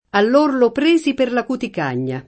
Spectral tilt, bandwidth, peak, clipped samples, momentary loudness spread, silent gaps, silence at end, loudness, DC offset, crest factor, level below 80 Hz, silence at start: -6 dB/octave; 8.8 kHz; -2 dBFS; under 0.1%; 8 LU; none; 0.05 s; -17 LUFS; under 0.1%; 16 dB; -56 dBFS; 0.15 s